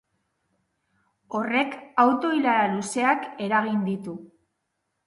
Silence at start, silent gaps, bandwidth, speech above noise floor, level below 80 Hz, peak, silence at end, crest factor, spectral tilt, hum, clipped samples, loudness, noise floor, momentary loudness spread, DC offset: 1.3 s; none; 11.5 kHz; 54 dB; -72 dBFS; -6 dBFS; 0.8 s; 20 dB; -5 dB/octave; none; under 0.1%; -24 LUFS; -78 dBFS; 12 LU; under 0.1%